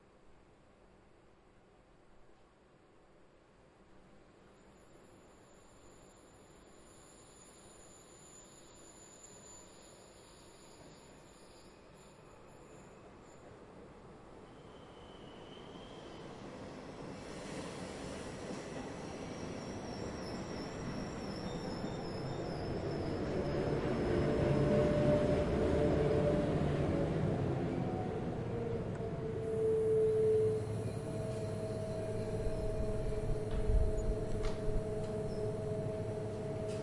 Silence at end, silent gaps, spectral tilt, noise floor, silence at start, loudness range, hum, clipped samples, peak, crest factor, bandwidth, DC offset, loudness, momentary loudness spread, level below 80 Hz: 0 s; none; -7 dB/octave; -64 dBFS; 0.25 s; 24 LU; none; under 0.1%; -18 dBFS; 20 dB; 11.5 kHz; under 0.1%; -37 LUFS; 25 LU; -48 dBFS